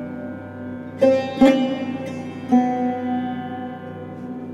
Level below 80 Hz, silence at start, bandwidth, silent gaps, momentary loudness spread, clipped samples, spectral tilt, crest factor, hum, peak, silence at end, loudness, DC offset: -54 dBFS; 0 s; 9 kHz; none; 17 LU; under 0.1%; -7 dB/octave; 18 dB; none; -4 dBFS; 0 s; -21 LUFS; under 0.1%